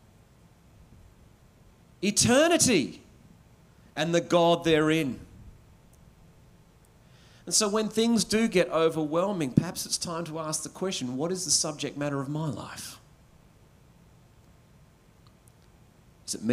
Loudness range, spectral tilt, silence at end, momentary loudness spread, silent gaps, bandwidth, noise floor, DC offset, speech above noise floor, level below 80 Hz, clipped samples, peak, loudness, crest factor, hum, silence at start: 8 LU; -3.5 dB/octave; 0 s; 15 LU; none; 16 kHz; -57 dBFS; under 0.1%; 31 dB; -58 dBFS; under 0.1%; -6 dBFS; -26 LUFS; 24 dB; none; 2 s